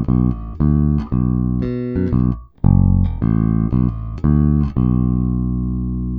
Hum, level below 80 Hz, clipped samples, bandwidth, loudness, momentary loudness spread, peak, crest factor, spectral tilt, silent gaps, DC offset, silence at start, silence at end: 60 Hz at -35 dBFS; -24 dBFS; under 0.1%; 4.6 kHz; -18 LUFS; 6 LU; 0 dBFS; 16 dB; -12.5 dB/octave; none; under 0.1%; 0 s; 0 s